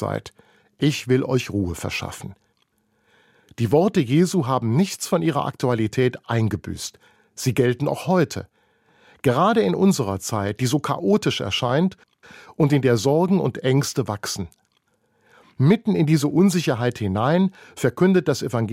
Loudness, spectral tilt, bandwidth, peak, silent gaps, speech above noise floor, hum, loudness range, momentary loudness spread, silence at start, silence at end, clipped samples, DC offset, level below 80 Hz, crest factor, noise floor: -21 LUFS; -6 dB/octave; 16 kHz; -4 dBFS; none; 46 dB; none; 3 LU; 10 LU; 0 s; 0 s; under 0.1%; under 0.1%; -54 dBFS; 18 dB; -67 dBFS